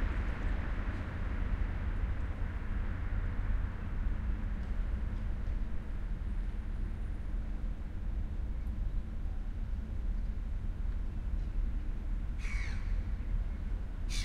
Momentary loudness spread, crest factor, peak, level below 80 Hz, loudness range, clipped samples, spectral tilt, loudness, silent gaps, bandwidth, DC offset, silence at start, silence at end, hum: 4 LU; 12 dB; -22 dBFS; -36 dBFS; 3 LU; under 0.1%; -6.5 dB/octave; -40 LUFS; none; 9.2 kHz; under 0.1%; 0 s; 0 s; none